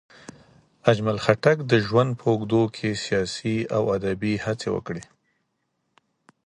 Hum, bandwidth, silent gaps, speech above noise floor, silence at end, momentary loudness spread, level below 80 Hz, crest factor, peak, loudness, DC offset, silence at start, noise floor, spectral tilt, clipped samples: none; 11 kHz; none; 52 dB; 1.45 s; 8 LU; -54 dBFS; 22 dB; -2 dBFS; -23 LUFS; under 0.1%; 0.85 s; -75 dBFS; -6 dB/octave; under 0.1%